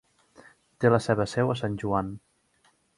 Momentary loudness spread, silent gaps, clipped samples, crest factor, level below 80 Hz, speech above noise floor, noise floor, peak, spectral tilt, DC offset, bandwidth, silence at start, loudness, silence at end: 10 LU; none; under 0.1%; 22 dB; -56 dBFS; 41 dB; -67 dBFS; -6 dBFS; -7 dB/octave; under 0.1%; 11.5 kHz; 0.8 s; -26 LUFS; 0.8 s